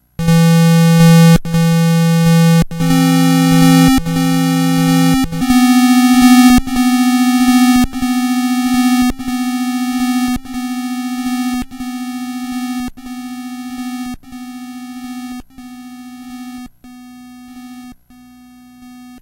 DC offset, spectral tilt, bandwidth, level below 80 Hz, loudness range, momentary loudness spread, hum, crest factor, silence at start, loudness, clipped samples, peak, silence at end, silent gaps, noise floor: under 0.1%; -5.5 dB/octave; 16 kHz; -34 dBFS; 20 LU; 21 LU; none; 12 dB; 0.2 s; -12 LUFS; under 0.1%; 0 dBFS; 0.05 s; none; -42 dBFS